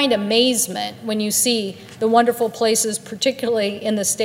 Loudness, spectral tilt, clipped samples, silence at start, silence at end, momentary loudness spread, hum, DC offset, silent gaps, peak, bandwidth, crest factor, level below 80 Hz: -19 LUFS; -2.5 dB/octave; under 0.1%; 0 s; 0 s; 7 LU; none; under 0.1%; none; -2 dBFS; 16 kHz; 18 dB; -66 dBFS